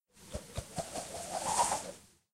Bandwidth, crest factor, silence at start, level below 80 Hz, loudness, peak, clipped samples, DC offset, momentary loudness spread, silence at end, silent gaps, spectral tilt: 16 kHz; 24 dB; 0.15 s; -56 dBFS; -36 LUFS; -16 dBFS; under 0.1%; under 0.1%; 16 LU; 0.3 s; none; -2.5 dB/octave